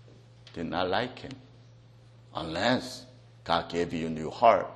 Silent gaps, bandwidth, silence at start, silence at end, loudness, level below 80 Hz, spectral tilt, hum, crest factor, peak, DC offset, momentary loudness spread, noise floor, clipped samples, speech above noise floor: none; 12.5 kHz; 0.05 s; 0 s; -29 LUFS; -58 dBFS; -5 dB/octave; none; 24 dB; -8 dBFS; under 0.1%; 21 LU; -54 dBFS; under 0.1%; 26 dB